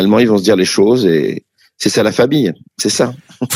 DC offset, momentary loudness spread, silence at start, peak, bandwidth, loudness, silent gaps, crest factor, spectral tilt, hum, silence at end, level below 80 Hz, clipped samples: under 0.1%; 8 LU; 0 s; 0 dBFS; over 20 kHz; -13 LUFS; none; 12 dB; -4.5 dB/octave; none; 0 s; -54 dBFS; under 0.1%